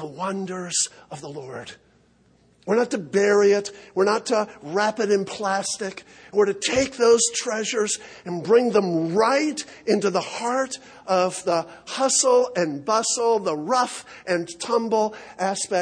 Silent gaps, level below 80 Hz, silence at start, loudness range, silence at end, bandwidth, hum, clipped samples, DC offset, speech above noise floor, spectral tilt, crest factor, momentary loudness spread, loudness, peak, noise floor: none; -64 dBFS; 0 s; 3 LU; 0 s; 10.5 kHz; none; under 0.1%; under 0.1%; 36 dB; -3 dB/octave; 16 dB; 13 LU; -22 LUFS; -6 dBFS; -59 dBFS